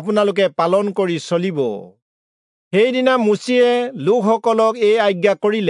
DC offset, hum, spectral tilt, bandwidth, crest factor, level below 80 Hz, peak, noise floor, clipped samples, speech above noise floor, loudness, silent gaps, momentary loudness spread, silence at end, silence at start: under 0.1%; none; -5.5 dB/octave; 11 kHz; 14 dB; -76 dBFS; -2 dBFS; under -90 dBFS; under 0.1%; over 74 dB; -16 LUFS; 2.02-2.71 s; 6 LU; 0 s; 0 s